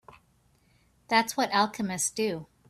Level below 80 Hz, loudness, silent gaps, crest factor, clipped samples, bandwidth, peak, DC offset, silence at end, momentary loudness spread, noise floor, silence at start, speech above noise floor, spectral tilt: -68 dBFS; -27 LUFS; none; 20 dB; under 0.1%; 15 kHz; -10 dBFS; under 0.1%; 0.25 s; 5 LU; -66 dBFS; 1.1 s; 38 dB; -2.5 dB/octave